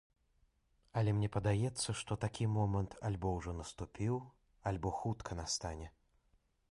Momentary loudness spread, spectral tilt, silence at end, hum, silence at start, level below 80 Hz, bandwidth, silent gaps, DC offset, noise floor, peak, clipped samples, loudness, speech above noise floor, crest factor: 10 LU; -5.5 dB/octave; 0.8 s; none; 0.95 s; -54 dBFS; 11.5 kHz; none; under 0.1%; -75 dBFS; -22 dBFS; under 0.1%; -39 LUFS; 38 dB; 16 dB